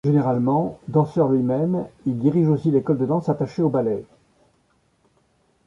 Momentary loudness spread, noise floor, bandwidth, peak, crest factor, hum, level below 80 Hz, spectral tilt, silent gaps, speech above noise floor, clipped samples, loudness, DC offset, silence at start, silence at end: 5 LU; -64 dBFS; 7.2 kHz; -6 dBFS; 16 dB; none; -58 dBFS; -10.5 dB/octave; none; 43 dB; under 0.1%; -21 LUFS; under 0.1%; 0.05 s; 1.6 s